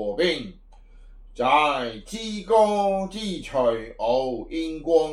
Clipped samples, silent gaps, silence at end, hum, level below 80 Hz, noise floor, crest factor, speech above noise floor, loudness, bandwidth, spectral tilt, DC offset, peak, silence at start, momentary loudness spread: under 0.1%; none; 0 s; none; -46 dBFS; -47 dBFS; 18 dB; 24 dB; -24 LUFS; 12 kHz; -4.5 dB/octave; under 0.1%; -6 dBFS; 0 s; 12 LU